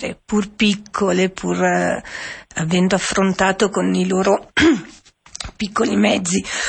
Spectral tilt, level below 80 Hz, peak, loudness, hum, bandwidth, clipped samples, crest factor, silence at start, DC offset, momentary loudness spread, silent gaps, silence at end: -4.5 dB/octave; -46 dBFS; -4 dBFS; -18 LUFS; none; 8.8 kHz; under 0.1%; 14 dB; 0 s; under 0.1%; 11 LU; none; 0 s